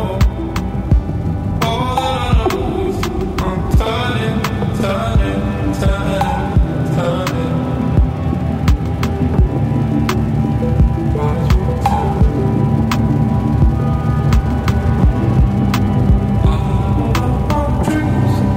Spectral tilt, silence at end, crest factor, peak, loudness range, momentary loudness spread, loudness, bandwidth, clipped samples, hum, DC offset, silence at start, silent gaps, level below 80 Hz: -7.5 dB/octave; 0 s; 14 dB; -2 dBFS; 2 LU; 4 LU; -16 LUFS; 16 kHz; under 0.1%; none; under 0.1%; 0 s; none; -20 dBFS